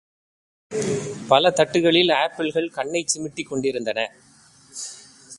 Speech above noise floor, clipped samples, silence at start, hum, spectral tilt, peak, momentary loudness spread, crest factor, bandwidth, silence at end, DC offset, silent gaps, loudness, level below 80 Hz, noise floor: 32 dB; under 0.1%; 0.7 s; none; -3.5 dB/octave; -2 dBFS; 17 LU; 22 dB; 11.5 kHz; 0 s; under 0.1%; none; -21 LUFS; -62 dBFS; -53 dBFS